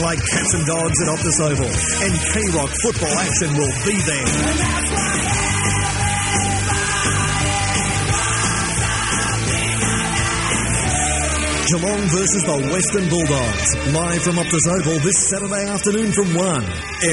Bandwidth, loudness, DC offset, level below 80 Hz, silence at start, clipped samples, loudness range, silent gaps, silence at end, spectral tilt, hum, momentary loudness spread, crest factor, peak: 11.5 kHz; -17 LUFS; under 0.1%; -32 dBFS; 0 s; under 0.1%; 1 LU; none; 0 s; -3.5 dB/octave; none; 2 LU; 14 dB; -4 dBFS